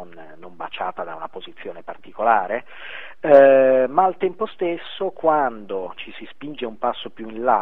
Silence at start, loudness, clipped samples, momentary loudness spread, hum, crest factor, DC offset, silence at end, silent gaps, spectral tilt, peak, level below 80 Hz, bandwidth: 0 s; -19 LUFS; under 0.1%; 22 LU; none; 20 dB; 1%; 0 s; none; -7.5 dB/octave; 0 dBFS; -64 dBFS; 4 kHz